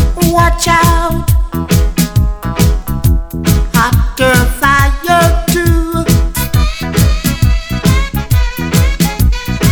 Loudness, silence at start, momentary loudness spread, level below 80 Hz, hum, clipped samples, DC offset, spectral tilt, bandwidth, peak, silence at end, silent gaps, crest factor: -12 LUFS; 0 s; 5 LU; -16 dBFS; none; 0.1%; under 0.1%; -5 dB/octave; over 20 kHz; 0 dBFS; 0 s; none; 10 dB